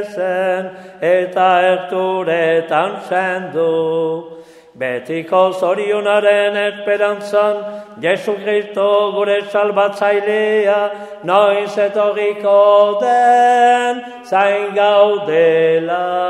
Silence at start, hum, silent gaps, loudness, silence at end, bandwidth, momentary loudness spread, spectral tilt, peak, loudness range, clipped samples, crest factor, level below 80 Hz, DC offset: 0 s; none; none; -15 LUFS; 0 s; 12 kHz; 9 LU; -5 dB/octave; 0 dBFS; 5 LU; under 0.1%; 14 dB; -70 dBFS; under 0.1%